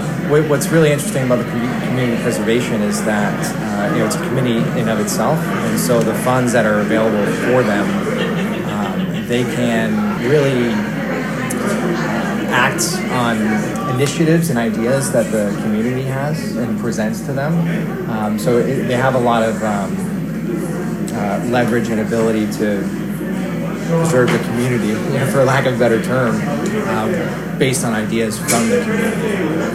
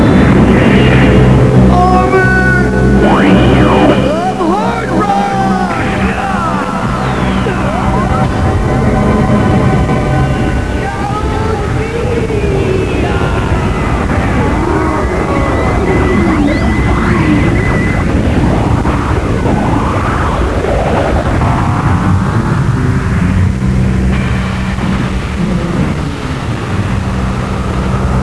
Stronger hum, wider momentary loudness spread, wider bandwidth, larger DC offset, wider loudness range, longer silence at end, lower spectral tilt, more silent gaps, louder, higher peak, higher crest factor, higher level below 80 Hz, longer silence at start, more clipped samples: neither; about the same, 6 LU vs 8 LU; first, 16 kHz vs 11 kHz; second, under 0.1% vs 2%; second, 3 LU vs 6 LU; about the same, 0 s vs 0 s; second, -5.5 dB/octave vs -7 dB/octave; neither; second, -17 LUFS vs -11 LUFS; about the same, -2 dBFS vs 0 dBFS; about the same, 14 dB vs 10 dB; second, -44 dBFS vs -18 dBFS; about the same, 0 s vs 0 s; second, under 0.1% vs 0.4%